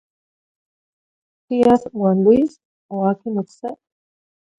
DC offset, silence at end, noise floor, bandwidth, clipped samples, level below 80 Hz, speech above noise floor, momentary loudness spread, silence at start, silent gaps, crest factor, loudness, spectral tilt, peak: under 0.1%; 0.85 s; under -90 dBFS; 9.2 kHz; under 0.1%; -56 dBFS; over 73 dB; 16 LU; 1.5 s; 2.65-2.89 s; 18 dB; -18 LUFS; -9 dB/octave; -2 dBFS